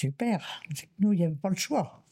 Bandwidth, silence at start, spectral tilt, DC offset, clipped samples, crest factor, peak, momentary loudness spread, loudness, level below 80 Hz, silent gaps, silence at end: 16.5 kHz; 0 s; -5.5 dB/octave; under 0.1%; under 0.1%; 14 dB; -16 dBFS; 12 LU; -29 LUFS; -70 dBFS; none; 0.15 s